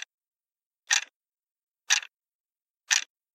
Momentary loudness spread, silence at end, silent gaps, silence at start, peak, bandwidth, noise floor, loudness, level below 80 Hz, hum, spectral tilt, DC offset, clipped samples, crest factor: 19 LU; 0.35 s; 1.16-1.20 s, 1.51-1.56 s, 1.63-1.67 s, 2.35-2.49 s, 2.70-2.74 s; 0.9 s; -4 dBFS; 16 kHz; under -90 dBFS; -26 LUFS; under -90 dBFS; none; 8.5 dB/octave; under 0.1%; under 0.1%; 28 dB